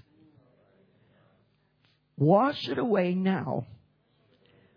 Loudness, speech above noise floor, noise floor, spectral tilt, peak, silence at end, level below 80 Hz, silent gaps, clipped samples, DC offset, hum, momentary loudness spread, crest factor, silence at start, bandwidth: -27 LUFS; 43 dB; -69 dBFS; -9 dB/octave; -10 dBFS; 1 s; -74 dBFS; none; under 0.1%; under 0.1%; none; 12 LU; 22 dB; 2.2 s; 5.4 kHz